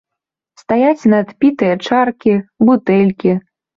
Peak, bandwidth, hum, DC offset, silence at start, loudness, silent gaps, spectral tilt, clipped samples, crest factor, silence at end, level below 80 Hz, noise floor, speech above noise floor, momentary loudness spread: -2 dBFS; 7.4 kHz; none; under 0.1%; 0.7 s; -14 LUFS; none; -8 dB/octave; under 0.1%; 12 dB; 0.4 s; -56 dBFS; -81 dBFS; 69 dB; 5 LU